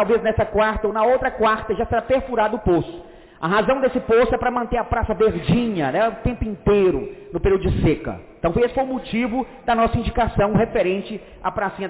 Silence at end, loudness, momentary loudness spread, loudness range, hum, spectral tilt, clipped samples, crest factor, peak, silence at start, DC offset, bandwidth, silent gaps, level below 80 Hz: 0 s; -20 LUFS; 8 LU; 1 LU; none; -11 dB/octave; under 0.1%; 10 dB; -10 dBFS; 0 s; under 0.1%; 4 kHz; none; -34 dBFS